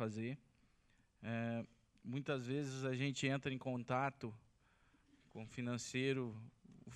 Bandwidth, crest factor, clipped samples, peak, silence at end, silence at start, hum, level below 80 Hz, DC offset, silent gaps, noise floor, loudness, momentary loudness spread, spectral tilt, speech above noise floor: 11 kHz; 20 dB; under 0.1%; -24 dBFS; 0 s; 0 s; none; -78 dBFS; under 0.1%; none; -74 dBFS; -43 LUFS; 17 LU; -5.5 dB/octave; 32 dB